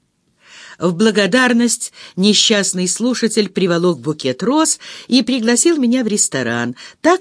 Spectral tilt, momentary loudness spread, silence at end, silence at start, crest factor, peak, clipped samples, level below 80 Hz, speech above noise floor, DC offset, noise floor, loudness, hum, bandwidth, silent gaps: -3 dB/octave; 8 LU; 0 s; 0.55 s; 16 dB; 0 dBFS; under 0.1%; -64 dBFS; 39 dB; under 0.1%; -54 dBFS; -15 LUFS; none; 11 kHz; none